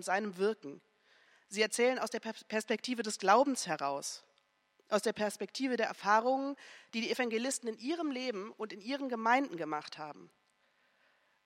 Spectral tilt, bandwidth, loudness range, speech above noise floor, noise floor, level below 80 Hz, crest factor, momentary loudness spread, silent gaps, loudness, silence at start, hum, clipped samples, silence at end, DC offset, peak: -3 dB/octave; 16 kHz; 4 LU; 40 dB; -74 dBFS; under -90 dBFS; 22 dB; 13 LU; none; -34 LUFS; 0 s; none; under 0.1%; 1.2 s; under 0.1%; -12 dBFS